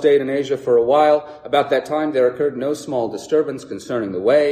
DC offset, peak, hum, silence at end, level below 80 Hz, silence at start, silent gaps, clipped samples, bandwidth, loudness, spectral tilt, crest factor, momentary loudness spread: under 0.1%; -4 dBFS; none; 0 s; -62 dBFS; 0 s; none; under 0.1%; 13.5 kHz; -19 LUFS; -5.5 dB/octave; 14 dB; 9 LU